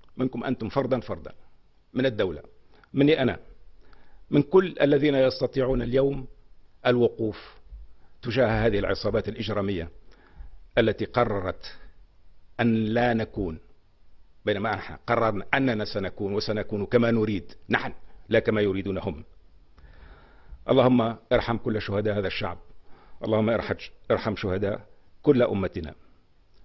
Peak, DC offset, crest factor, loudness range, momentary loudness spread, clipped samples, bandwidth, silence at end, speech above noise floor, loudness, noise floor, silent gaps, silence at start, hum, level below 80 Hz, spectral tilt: -6 dBFS; under 0.1%; 20 dB; 4 LU; 14 LU; under 0.1%; 6 kHz; 0.7 s; 31 dB; -26 LUFS; -56 dBFS; none; 0.05 s; none; -46 dBFS; -8 dB/octave